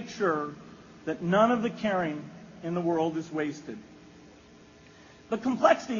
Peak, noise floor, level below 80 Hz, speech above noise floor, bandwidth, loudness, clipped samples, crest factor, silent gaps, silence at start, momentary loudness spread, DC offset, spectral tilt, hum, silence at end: -8 dBFS; -54 dBFS; -66 dBFS; 26 dB; 7.2 kHz; -28 LUFS; under 0.1%; 22 dB; none; 0 s; 19 LU; under 0.1%; -5 dB/octave; none; 0 s